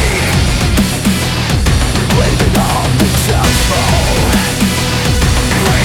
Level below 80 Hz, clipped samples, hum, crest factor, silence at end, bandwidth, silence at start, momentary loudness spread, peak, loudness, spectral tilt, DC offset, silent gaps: -18 dBFS; under 0.1%; none; 10 dB; 0 s; 19 kHz; 0 s; 2 LU; 0 dBFS; -12 LUFS; -4.5 dB/octave; under 0.1%; none